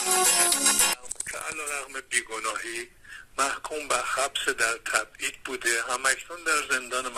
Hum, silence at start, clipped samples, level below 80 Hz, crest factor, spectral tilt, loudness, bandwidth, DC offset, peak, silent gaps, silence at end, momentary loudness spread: none; 0 s; under 0.1%; -58 dBFS; 20 dB; 1 dB/octave; -25 LUFS; 16 kHz; under 0.1%; -8 dBFS; none; 0 s; 14 LU